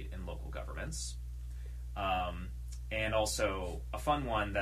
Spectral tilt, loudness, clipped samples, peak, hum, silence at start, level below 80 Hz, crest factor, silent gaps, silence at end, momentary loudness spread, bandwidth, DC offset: -4 dB/octave; -37 LUFS; under 0.1%; -18 dBFS; none; 0 s; -42 dBFS; 20 dB; none; 0 s; 13 LU; 15 kHz; under 0.1%